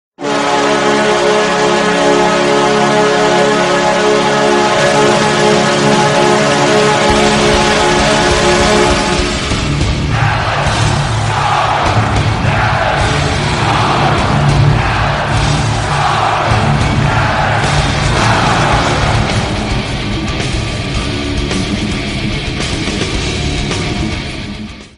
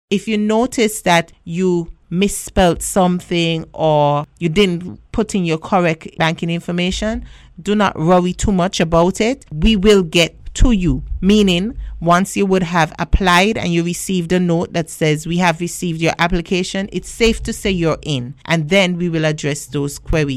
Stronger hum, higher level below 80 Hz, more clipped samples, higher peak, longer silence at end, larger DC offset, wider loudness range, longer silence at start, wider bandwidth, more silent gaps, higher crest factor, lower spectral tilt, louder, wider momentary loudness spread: neither; about the same, -24 dBFS vs -28 dBFS; neither; first, 0 dBFS vs -4 dBFS; about the same, 0.1 s vs 0 s; neither; first, 7 LU vs 3 LU; about the same, 0.2 s vs 0.1 s; second, 11 kHz vs 14.5 kHz; neither; about the same, 12 dB vs 12 dB; about the same, -4.5 dB/octave vs -5 dB/octave; first, -12 LUFS vs -16 LUFS; about the same, 7 LU vs 8 LU